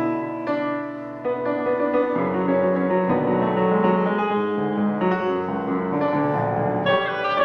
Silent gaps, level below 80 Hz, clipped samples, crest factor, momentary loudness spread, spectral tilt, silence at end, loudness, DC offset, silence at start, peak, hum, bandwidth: none; -58 dBFS; under 0.1%; 14 dB; 6 LU; -9 dB/octave; 0 s; -22 LUFS; under 0.1%; 0 s; -8 dBFS; none; 6 kHz